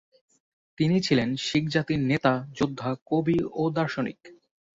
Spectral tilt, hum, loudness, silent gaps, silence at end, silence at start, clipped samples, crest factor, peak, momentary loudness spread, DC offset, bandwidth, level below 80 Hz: -6 dB/octave; none; -26 LUFS; 3.02-3.06 s; 0.4 s; 0.8 s; under 0.1%; 18 dB; -8 dBFS; 6 LU; under 0.1%; 8 kHz; -58 dBFS